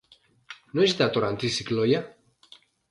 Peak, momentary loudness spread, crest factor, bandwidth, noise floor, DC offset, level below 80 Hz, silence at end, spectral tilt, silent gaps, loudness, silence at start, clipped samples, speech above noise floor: -8 dBFS; 23 LU; 20 dB; 11.5 kHz; -55 dBFS; under 0.1%; -62 dBFS; 0.8 s; -5 dB/octave; none; -25 LUFS; 0.5 s; under 0.1%; 31 dB